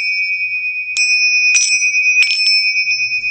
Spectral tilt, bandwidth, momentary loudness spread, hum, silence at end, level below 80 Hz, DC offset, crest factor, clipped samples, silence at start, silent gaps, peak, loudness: 5.5 dB/octave; 9 kHz; 6 LU; none; 0 s; -66 dBFS; under 0.1%; 14 dB; under 0.1%; 0 s; none; 0 dBFS; -11 LUFS